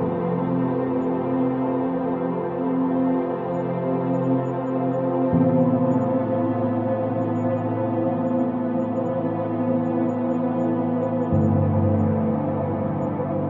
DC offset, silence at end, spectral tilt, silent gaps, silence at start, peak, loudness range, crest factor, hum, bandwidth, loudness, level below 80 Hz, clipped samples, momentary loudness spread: under 0.1%; 0 s; -11.5 dB/octave; none; 0 s; -8 dBFS; 2 LU; 14 dB; none; 3.9 kHz; -23 LUFS; -54 dBFS; under 0.1%; 5 LU